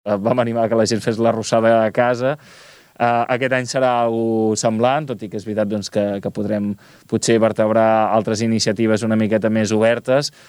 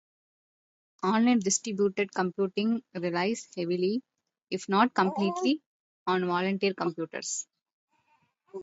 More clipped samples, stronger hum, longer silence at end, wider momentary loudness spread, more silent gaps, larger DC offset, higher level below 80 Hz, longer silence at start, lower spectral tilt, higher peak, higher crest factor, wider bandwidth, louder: neither; neither; first, 0.2 s vs 0 s; second, 7 LU vs 11 LU; second, none vs 5.66-6.06 s, 7.62-7.66 s, 7.73-7.88 s; neither; first, -62 dBFS vs -76 dBFS; second, 0.05 s vs 1 s; about the same, -5 dB/octave vs -4.5 dB/octave; first, -2 dBFS vs -8 dBFS; about the same, 16 dB vs 20 dB; first, 13 kHz vs 8.2 kHz; first, -18 LUFS vs -29 LUFS